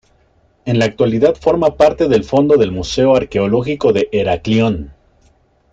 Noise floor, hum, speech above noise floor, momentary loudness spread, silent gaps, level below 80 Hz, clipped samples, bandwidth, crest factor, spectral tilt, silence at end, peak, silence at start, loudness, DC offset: -55 dBFS; none; 41 dB; 5 LU; none; -40 dBFS; under 0.1%; 7.8 kHz; 14 dB; -6.5 dB/octave; 0.8 s; 0 dBFS; 0.65 s; -14 LUFS; under 0.1%